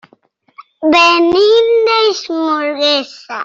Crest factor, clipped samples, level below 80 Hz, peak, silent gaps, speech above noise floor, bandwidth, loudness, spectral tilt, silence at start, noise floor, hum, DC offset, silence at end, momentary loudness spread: 12 dB; under 0.1%; -54 dBFS; -2 dBFS; none; 41 dB; 7.8 kHz; -11 LUFS; -2.5 dB/octave; 0.6 s; -53 dBFS; none; under 0.1%; 0 s; 9 LU